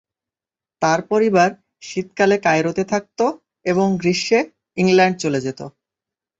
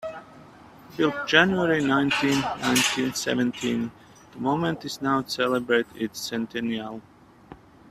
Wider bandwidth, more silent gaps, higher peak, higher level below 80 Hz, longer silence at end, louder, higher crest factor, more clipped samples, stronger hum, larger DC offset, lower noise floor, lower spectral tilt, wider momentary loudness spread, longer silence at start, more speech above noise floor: second, 8 kHz vs 15.5 kHz; neither; about the same, -2 dBFS vs 0 dBFS; about the same, -60 dBFS vs -60 dBFS; first, 0.7 s vs 0.35 s; first, -19 LUFS vs -24 LUFS; second, 18 dB vs 24 dB; neither; neither; neither; first, under -90 dBFS vs -49 dBFS; about the same, -5 dB/octave vs -4 dB/octave; about the same, 13 LU vs 12 LU; first, 0.8 s vs 0 s; first, over 72 dB vs 24 dB